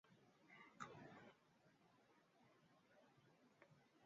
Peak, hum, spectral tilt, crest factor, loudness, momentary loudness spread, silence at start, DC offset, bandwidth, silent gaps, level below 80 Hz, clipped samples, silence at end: -40 dBFS; none; -4 dB/octave; 28 dB; -62 LUFS; 10 LU; 0.05 s; under 0.1%; 7.2 kHz; none; under -90 dBFS; under 0.1%; 0 s